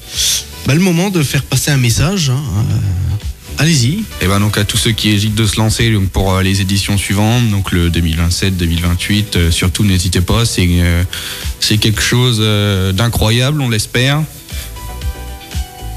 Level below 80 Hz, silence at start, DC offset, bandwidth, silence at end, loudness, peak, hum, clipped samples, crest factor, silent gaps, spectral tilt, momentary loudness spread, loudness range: -28 dBFS; 0 s; under 0.1%; 15 kHz; 0 s; -13 LUFS; -4 dBFS; none; under 0.1%; 10 dB; none; -4.5 dB/octave; 10 LU; 1 LU